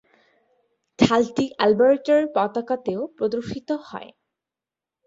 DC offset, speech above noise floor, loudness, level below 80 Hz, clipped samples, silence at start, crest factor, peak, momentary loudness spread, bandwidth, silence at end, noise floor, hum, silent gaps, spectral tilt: under 0.1%; 68 dB; -22 LUFS; -58 dBFS; under 0.1%; 1 s; 22 dB; -2 dBFS; 12 LU; 7.8 kHz; 1 s; -89 dBFS; none; none; -6 dB/octave